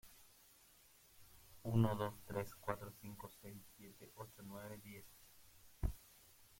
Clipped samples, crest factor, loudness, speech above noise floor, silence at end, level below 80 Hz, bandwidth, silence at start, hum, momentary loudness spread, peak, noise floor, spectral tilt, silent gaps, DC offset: under 0.1%; 26 dB; -45 LUFS; 23 dB; 0.05 s; -58 dBFS; 16.5 kHz; 0.05 s; none; 26 LU; -22 dBFS; -68 dBFS; -7 dB/octave; none; under 0.1%